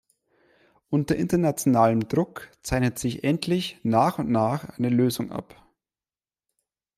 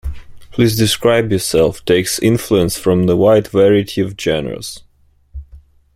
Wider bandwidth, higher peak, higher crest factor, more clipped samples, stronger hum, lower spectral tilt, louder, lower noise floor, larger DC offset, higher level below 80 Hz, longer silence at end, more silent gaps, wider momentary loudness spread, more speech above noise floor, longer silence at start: about the same, 15.5 kHz vs 16.5 kHz; second, -6 dBFS vs 0 dBFS; about the same, 18 dB vs 14 dB; neither; neither; about the same, -6 dB/octave vs -5 dB/octave; second, -24 LUFS vs -14 LUFS; first, under -90 dBFS vs -43 dBFS; neither; second, -50 dBFS vs -36 dBFS; first, 1.55 s vs 0.4 s; neither; second, 9 LU vs 14 LU; first, over 66 dB vs 29 dB; first, 0.9 s vs 0.05 s